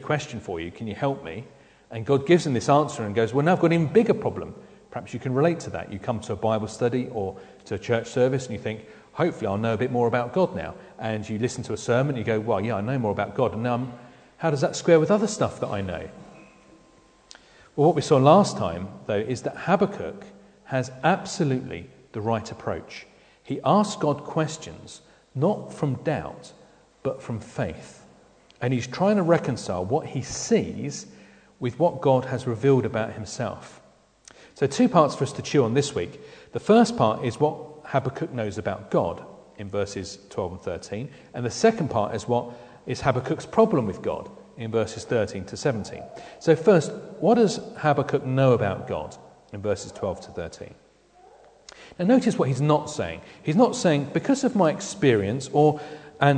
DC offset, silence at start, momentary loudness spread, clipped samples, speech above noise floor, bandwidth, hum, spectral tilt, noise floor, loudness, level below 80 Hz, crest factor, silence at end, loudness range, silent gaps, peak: under 0.1%; 0 s; 16 LU; under 0.1%; 32 dB; 9.4 kHz; none; -6 dB/octave; -56 dBFS; -24 LUFS; -58 dBFS; 22 dB; 0 s; 6 LU; none; -2 dBFS